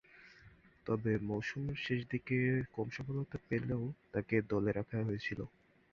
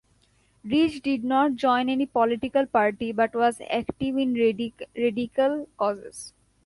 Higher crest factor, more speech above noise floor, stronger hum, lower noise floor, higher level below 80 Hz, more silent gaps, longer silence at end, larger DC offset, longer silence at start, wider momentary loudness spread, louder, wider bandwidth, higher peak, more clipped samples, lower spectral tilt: about the same, 20 dB vs 16 dB; second, 25 dB vs 39 dB; neither; about the same, -62 dBFS vs -64 dBFS; about the same, -62 dBFS vs -58 dBFS; neither; about the same, 0.45 s vs 0.35 s; neither; second, 0.15 s vs 0.65 s; about the same, 8 LU vs 10 LU; second, -38 LUFS vs -25 LUFS; second, 7 kHz vs 11.5 kHz; second, -18 dBFS vs -8 dBFS; neither; first, -6.5 dB/octave vs -5 dB/octave